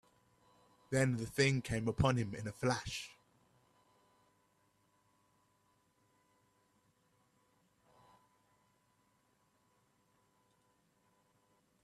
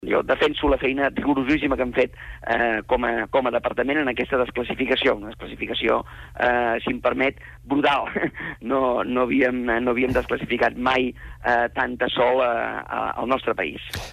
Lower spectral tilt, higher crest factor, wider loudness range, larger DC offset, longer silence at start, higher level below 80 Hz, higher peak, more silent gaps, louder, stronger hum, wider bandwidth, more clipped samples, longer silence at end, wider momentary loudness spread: about the same, -5.5 dB/octave vs -6 dB/octave; first, 24 dB vs 14 dB; first, 9 LU vs 1 LU; neither; first, 0.9 s vs 0 s; second, -62 dBFS vs -42 dBFS; second, -18 dBFS vs -8 dBFS; neither; second, -36 LUFS vs -22 LUFS; first, 50 Hz at -75 dBFS vs none; about the same, 14 kHz vs 14 kHz; neither; first, 8.75 s vs 0 s; first, 11 LU vs 7 LU